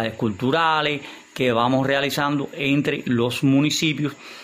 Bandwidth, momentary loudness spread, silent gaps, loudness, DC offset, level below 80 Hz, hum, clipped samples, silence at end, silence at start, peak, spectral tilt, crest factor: 16 kHz; 6 LU; none; -21 LUFS; under 0.1%; -58 dBFS; none; under 0.1%; 0 s; 0 s; -6 dBFS; -5 dB/octave; 16 dB